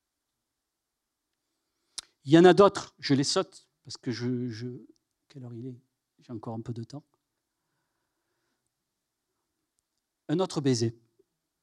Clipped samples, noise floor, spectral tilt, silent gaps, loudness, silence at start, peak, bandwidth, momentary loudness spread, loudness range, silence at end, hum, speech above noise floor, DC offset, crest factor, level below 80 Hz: under 0.1%; -85 dBFS; -5.5 dB/octave; none; -25 LUFS; 2.25 s; -6 dBFS; 11.5 kHz; 25 LU; 20 LU; 0.7 s; none; 59 dB; under 0.1%; 24 dB; -72 dBFS